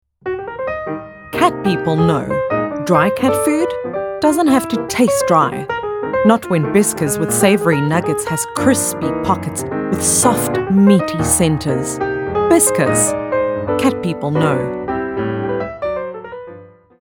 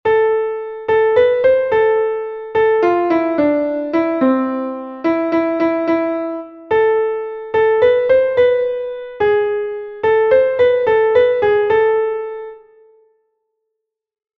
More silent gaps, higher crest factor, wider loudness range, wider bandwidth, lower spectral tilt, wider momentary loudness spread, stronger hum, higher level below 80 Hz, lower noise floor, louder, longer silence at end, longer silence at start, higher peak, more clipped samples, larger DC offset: neither; about the same, 16 dB vs 14 dB; about the same, 3 LU vs 3 LU; first, 19.5 kHz vs 5.8 kHz; second, -5 dB/octave vs -7.5 dB/octave; about the same, 10 LU vs 11 LU; neither; first, -44 dBFS vs -52 dBFS; second, -39 dBFS vs -77 dBFS; about the same, -16 LUFS vs -16 LUFS; second, 0.4 s vs 1.8 s; first, 0.25 s vs 0.05 s; about the same, 0 dBFS vs -2 dBFS; neither; neither